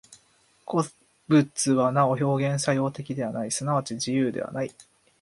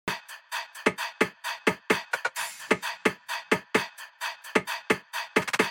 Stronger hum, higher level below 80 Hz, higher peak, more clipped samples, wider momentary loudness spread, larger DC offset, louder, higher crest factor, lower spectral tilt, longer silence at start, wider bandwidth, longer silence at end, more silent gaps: neither; first, -66 dBFS vs -72 dBFS; about the same, -8 dBFS vs -8 dBFS; neither; about the same, 10 LU vs 9 LU; neither; first, -25 LUFS vs -29 LUFS; about the same, 18 dB vs 22 dB; first, -5.5 dB/octave vs -3 dB/octave; about the same, 0.1 s vs 0.05 s; second, 11.5 kHz vs 17 kHz; first, 0.4 s vs 0 s; neither